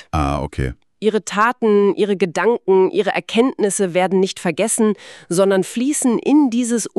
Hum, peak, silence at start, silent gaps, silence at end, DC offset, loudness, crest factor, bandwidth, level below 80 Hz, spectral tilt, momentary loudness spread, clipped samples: none; -2 dBFS; 0.15 s; none; 0.1 s; under 0.1%; -17 LUFS; 14 dB; 13.5 kHz; -38 dBFS; -5 dB/octave; 7 LU; under 0.1%